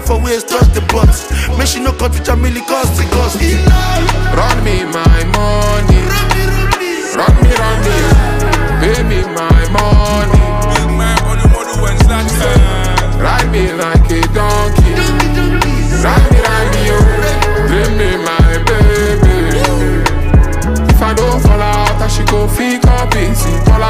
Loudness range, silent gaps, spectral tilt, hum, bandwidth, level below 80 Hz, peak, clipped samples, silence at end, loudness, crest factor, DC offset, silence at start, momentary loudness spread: 1 LU; none; -5.5 dB/octave; none; 15.5 kHz; -12 dBFS; 0 dBFS; under 0.1%; 0 s; -11 LUFS; 10 dB; under 0.1%; 0 s; 4 LU